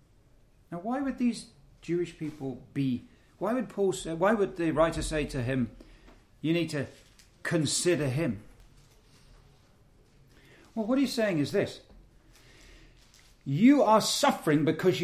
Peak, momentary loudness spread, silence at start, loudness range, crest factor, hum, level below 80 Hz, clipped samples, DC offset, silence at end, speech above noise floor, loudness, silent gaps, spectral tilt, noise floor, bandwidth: -10 dBFS; 15 LU; 0.7 s; 7 LU; 20 dB; none; -52 dBFS; under 0.1%; under 0.1%; 0 s; 33 dB; -28 LUFS; none; -5 dB/octave; -60 dBFS; 15.5 kHz